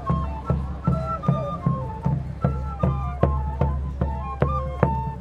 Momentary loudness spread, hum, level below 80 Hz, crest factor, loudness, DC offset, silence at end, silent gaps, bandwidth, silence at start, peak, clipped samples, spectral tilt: 3 LU; none; -30 dBFS; 24 dB; -25 LUFS; under 0.1%; 0 s; none; 5.4 kHz; 0 s; 0 dBFS; under 0.1%; -10 dB/octave